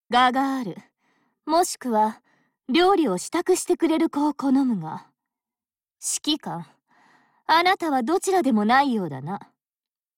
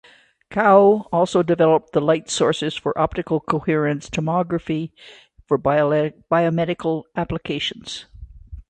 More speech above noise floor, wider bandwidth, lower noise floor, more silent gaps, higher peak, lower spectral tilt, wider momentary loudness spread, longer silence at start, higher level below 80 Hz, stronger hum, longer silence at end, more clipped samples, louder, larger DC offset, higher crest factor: first, over 68 dB vs 26 dB; first, 17 kHz vs 9.6 kHz; first, under -90 dBFS vs -46 dBFS; neither; second, -6 dBFS vs -2 dBFS; second, -3.5 dB/octave vs -5.5 dB/octave; first, 16 LU vs 10 LU; second, 0.1 s vs 0.5 s; second, -66 dBFS vs -48 dBFS; neither; first, 0.8 s vs 0.1 s; neither; about the same, -22 LUFS vs -20 LUFS; neither; about the same, 16 dB vs 18 dB